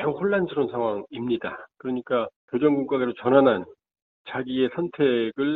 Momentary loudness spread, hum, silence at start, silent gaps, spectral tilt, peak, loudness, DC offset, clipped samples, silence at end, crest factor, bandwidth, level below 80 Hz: 12 LU; none; 0 s; 2.36-2.48 s, 4.02-4.25 s; -5 dB/octave; -6 dBFS; -24 LUFS; under 0.1%; under 0.1%; 0 s; 18 dB; 4.3 kHz; -64 dBFS